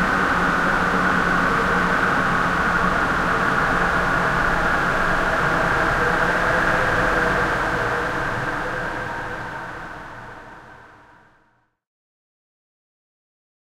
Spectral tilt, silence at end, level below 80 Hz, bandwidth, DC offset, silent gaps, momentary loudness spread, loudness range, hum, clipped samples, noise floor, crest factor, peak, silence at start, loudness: -5 dB/octave; 2.85 s; -36 dBFS; 16 kHz; under 0.1%; none; 11 LU; 13 LU; none; under 0.1%; -63 dBFS; 16 dB; -6 dBFS; 0 s; -20 LUFS